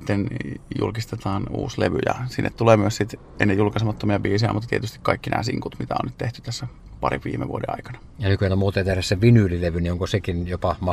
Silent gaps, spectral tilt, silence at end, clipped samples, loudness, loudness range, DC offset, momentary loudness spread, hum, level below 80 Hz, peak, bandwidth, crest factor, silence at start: none; -6.5 dB/octave; 0 s; under 0.1%; -23 LUFS; 5 LU; under 0.1%; 11 LU; none; -42 dBFS; -2 dBFS; 13.5 kHz; 20 dB; 0 s